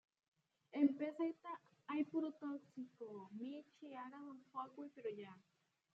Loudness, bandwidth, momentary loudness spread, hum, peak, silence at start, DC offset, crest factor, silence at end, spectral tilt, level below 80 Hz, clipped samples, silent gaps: -46 LUFS; 5.4 kHz; 17 LU; none; -24 dBFS; 0.75 s; under 0.1%; 22 dB; 0.55 s; -5 dB/octave; under -90 dBFS; under 0.1%; none